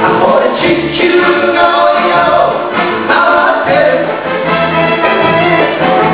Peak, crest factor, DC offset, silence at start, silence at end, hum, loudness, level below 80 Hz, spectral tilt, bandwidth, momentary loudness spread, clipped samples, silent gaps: 0 dBFS; 10 dB; 0.4%; 0 s; 0 s; none; -9 LUFS; -42 dBFS; -9 dB/octave; 4 kHz; 4 LU; 0.4%; none